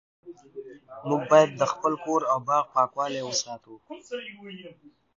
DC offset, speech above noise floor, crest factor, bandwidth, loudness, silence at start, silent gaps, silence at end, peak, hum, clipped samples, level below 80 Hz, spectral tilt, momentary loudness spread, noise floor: under 0.1%; 18 dB; 24 dB; 7.6 kHz; -25 LUFS; 0.25 s; none; 0.45 s; -4 dBFS; none; under 0.1%; -74 dBFS; -4 dB/octave; 24 LU; -44 dBFS